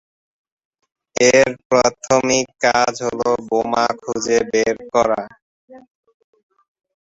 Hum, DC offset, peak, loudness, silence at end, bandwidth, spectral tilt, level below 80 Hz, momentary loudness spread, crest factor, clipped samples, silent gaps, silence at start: none; under 0.1%; 0 dBFS; -17 LUFS; 1.25 s; 8 kHz; -3 dB/octave; -54 dBFS; 7 LU; 18 dB; under 0.1%; 1.65-1.70 s, 5.42-5.68 s; 1.2 s